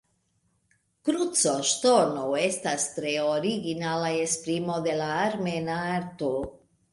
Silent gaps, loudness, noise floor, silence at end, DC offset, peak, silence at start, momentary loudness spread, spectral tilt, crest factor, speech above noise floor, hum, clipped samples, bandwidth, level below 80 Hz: none; -26 LUFS; -71 dBFS; 0.35 s; under 0.1%; -10 dBFS; 1.05 s; 8 LU; -3.5 dB/octave; 18 dB; 45 dB; none; under 0.1%; 11.5 kHz; -62 dBFS